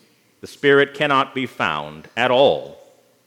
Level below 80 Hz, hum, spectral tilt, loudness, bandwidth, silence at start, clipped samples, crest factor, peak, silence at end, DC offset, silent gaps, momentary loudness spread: -64 dBFS; none; -5 dB/octave; -18 LUFS; 13 kHz; 0.45 s; under 0.1%; 18 dB; -2 dBFS; 0.55 s; under 0.1%; none; 11 LU